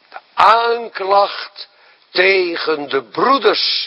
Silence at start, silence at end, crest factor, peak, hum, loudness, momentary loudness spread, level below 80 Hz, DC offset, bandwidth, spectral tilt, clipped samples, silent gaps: 0.15 s; 0 s; 16 dB; 0 dBFS; none; -15 LUFS; 15 LU; -64 dBFS; under 0.1%; 11 kHz; -4 dB/octave; under 0.1%; none